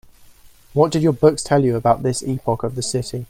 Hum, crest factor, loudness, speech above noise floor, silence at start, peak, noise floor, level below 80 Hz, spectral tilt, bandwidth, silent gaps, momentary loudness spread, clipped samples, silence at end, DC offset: none; 18 dB; -19 LUFS; 29 dB; 0.45 s; 0 dBFS; -47 dBFS; -48 dBFS; -6 dB/octave; 16 kHz; none; 8 LU; under 0.1%; 0.05 s; under 0.1%